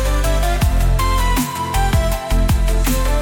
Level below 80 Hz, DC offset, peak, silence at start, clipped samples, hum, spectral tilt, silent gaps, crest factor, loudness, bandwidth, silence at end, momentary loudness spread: -16 dBFS; under 0.1%; -6 dBFS; 0 s; under 0.1%; none; -5 dB/octave; none; 10 dB; -18 LUFS; 17.5 kHz; 0 s; 2 LU